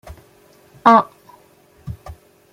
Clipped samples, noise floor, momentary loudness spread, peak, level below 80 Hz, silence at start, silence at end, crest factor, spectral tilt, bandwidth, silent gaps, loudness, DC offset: under 0.1%; -52 dBFS; 23 LU; 0 dBFS; -48 dBFS; 0.85 s; 0.4 s; 20 dB; -6.5 dB/octave; 16 kHz; none; -14 LUFS; under 0.1%